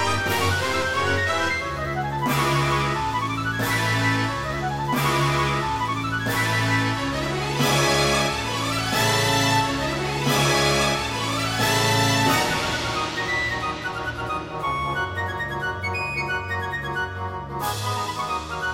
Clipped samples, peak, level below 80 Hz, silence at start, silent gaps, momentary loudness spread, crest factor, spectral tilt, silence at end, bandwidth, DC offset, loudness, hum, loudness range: under 0.1%; -6 dBFS; -42 dBFS; 0 s; none; 8 LU; 18 dB; -4 dB/octave; 0 s; 16.5 kHz; under 0.1%; -23 LUFS; none; 6 LU